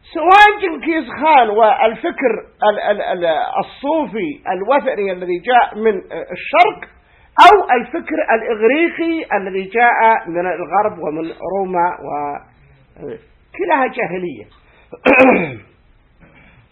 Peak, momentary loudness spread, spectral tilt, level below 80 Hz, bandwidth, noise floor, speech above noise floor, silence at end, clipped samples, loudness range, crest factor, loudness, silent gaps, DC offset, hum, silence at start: 0 dBFS; 15 LU; -5.5 dB/octave; -50 dBFS; 11 kHz; -51 dBFS; 36 dB; 1.1 s; 0.2%; 8 LU; 16 dB; -15 LUFS; none; under 0.1%; none; 0.15 s